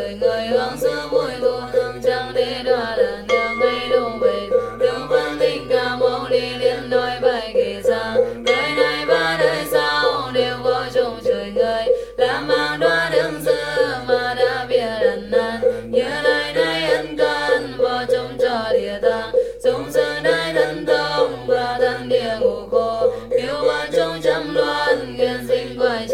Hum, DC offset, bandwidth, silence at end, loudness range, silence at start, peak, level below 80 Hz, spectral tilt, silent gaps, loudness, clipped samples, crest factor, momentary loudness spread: none; under 0.1%; 15.5 kHz; 0 s; 1 LU; 0 s; -2 dBFS; -46 dBFS; -4 dB/octave; none; -19 LUFS; under 0.1%; 16 dB; 3 LU